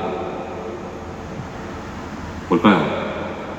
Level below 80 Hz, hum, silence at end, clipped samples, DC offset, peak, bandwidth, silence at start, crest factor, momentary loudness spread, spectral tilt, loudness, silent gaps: -44 dBFS; none; 0 s; under 0.1%; under 0.1%; -2 dBFS; 8.4 kHz; 0 s; 22 dB; 16 LU; -6.5 dB/octave; -23 LUFS; none